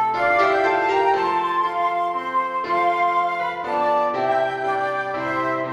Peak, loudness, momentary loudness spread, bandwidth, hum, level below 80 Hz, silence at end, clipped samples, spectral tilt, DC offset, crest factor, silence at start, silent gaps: -6 dBFS; -21 LUFS; 5 LU; 12 kHz; none; -60 dBFS; 0 s; under 0.1%; -5 dB/octave; under 0.1%; 14 dB; 0 s; none